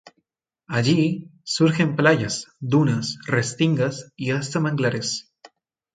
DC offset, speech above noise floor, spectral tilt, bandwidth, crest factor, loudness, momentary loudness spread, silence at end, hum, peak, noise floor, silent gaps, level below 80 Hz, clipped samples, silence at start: under 0.1%; 52 dB; -5.5 dB/octave; 9.4 kHz; 20 dB; -22 LUFS; 9 LU; 0.75 s; none; -2 dBFS; -73 dBFS; none; -60 dBFS; under 0.1%; 0.7 s